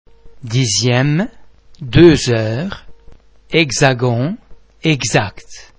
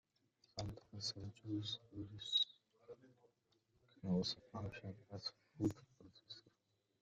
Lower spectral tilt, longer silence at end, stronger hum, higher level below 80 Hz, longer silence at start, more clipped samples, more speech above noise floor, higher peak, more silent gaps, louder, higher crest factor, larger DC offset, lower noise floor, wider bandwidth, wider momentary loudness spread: about the same, -5 dB/octave vs -5 dB/octave; second, 0.15 s vs 0.6 s; neither; first, -36 dBFS vs -72 dBFS; second, 0.25 s vs 0.55 s; first, 0.2% vs under 0.1%; second, 27 dB vs 39 dB; first, 0 dBFS vs -26 dBFS; neither; first, -14 LUFS vs -44 LUFS; second, 16 dB vs 22 dB; neither; second, -41 dBFS vs -84 dBFS; second, 8 kHz vs 9 kHz; second, 17 LU vs 20 LU